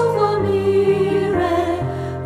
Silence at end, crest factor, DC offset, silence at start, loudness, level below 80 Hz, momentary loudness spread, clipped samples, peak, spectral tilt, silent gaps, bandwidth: 0 s; 14 dB; under 0.1%; 0 s; -18 LUFS; -42 dBFS; 6 LU; under 0.1%; -4 dBFS; -7.5 dB/octave; none; 12.5 kHz